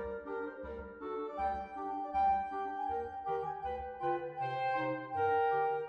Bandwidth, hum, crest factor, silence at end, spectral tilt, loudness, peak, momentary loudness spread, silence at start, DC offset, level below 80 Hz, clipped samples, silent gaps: 6.2 kHz; none; 14 dB; 0 s; -7.5 dB/octave; -36 LUFS; -22 dBFS; 10 LU; 0 s; under 0.1%; -60 dBFS; under 0.1%; none